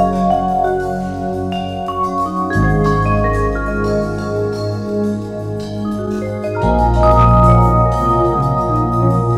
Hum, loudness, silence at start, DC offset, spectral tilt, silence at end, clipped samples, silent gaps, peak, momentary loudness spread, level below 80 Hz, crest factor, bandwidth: none; -16 LUFS; 0 s; under 0.1%; -8.5 dB/octave; 0 s; under 0.1%; none; 0 dBFS; 11 LU; -24 dBFS; 14 dB; 12 kHz